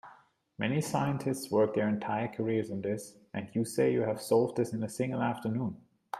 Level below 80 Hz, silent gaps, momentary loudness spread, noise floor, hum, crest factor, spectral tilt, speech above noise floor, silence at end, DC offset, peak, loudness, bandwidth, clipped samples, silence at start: -70 dBFS; none; 8 LU; -61 dBFS; none; 18 dB; -6.5 dB/octave; 30 dB; 0 s; under 0.1%; -14 dBFS; -32 LUFS; 15.5 kHz; under 0.1%; 0.05 s